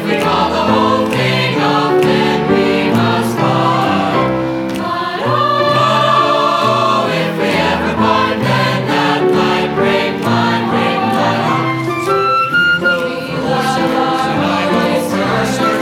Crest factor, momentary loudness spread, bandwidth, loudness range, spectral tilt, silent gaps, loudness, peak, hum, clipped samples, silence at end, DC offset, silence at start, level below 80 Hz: 12 dB; 4 LU; 17 kHz; 1 LU; -5.5 dB/octave; none; -13 LUFS; 0 dBFS; none; under 0.1%; 0 s; under 0.1%; 0 s; -44 dBFS